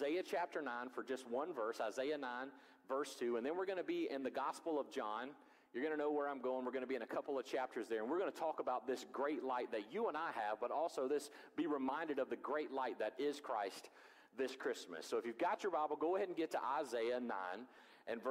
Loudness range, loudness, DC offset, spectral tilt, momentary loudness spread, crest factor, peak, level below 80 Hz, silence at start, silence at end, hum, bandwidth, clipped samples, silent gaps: 2 LU; -43 LUFS; under 0.1%; -4 dB/octave; 6 LU; 14 dB; -28 dBFS; -90 dBFS; 0 s; 0 s; none; 16 kHz; under 0.1%; none